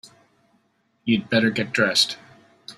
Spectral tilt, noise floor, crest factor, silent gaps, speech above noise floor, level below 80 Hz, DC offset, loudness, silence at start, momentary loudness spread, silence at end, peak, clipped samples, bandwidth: -3.5 dB/octave; -66 dBFS; 20 dB; none; 45 dB; -64 dBFS; under 0.1%; -21 LUFS; 1.05 s; 11 LU; 0.05 s; -6 dBFS; under 0.1%; 14.5 kHz